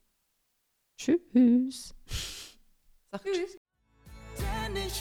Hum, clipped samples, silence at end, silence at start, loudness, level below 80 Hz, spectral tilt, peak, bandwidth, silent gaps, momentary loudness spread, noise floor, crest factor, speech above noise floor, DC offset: none; under 0.1%; 0 s; 1 s; -30 LUFS; -46 dBFS; -5 dB/octave; -14 dBFS; 16 kHz; 3.57-3.65 s; 21 LU; -77 dBFS; 18 dB; 49 dB; under 0.1%